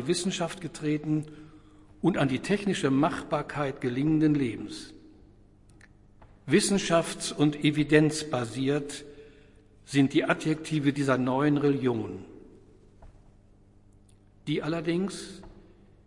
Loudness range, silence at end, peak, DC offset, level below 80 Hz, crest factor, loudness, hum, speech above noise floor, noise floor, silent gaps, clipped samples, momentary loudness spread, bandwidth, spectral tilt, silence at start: 9 LU; 0.45 s; -6 dBFS; under 0.1%; -56 dBFS; 22 dB; -27 LUFS; 50 Hz at -55 dBFS; 30 dB; -57 dBFS; none; under 0.1%; 16 LU; 11.5 kHz; -5.5 dB/octave; 0 s